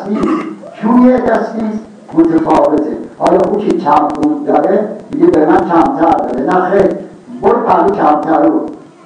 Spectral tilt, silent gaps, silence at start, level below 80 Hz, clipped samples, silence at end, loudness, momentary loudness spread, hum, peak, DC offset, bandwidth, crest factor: -8 dB/octave; none; 0 s; -44 dBFS; under 0.1%; 0.25 s; -11 LUFS; 10 LU; none; 0 dBFS; under 0.1%; 9.6 kHz; 12 dB